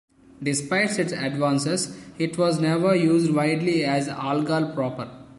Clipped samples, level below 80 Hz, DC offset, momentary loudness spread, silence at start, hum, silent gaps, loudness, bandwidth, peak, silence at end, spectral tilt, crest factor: under 0.1%; -62 dBFS; under 0.1%; 9 LU; 0.4 s; none; none; -23 LUFS; 11.5 kHz; -8 dBFS; 0.05 s; -5 dB/octave; 14 dB